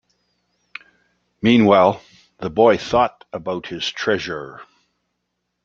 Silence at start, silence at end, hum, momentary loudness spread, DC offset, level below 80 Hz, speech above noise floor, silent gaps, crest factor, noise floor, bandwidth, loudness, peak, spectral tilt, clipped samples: 1.45 s; 1 s; 60 Hz at -50 dBFS; 24 LU; under 0.1%; -54 dBFS; 58 dB; none; 20 dB; -75 dBFS; 7.4 kHz; -18 LUFS; -2 dBFS; -6 dB/octave; under 0.1%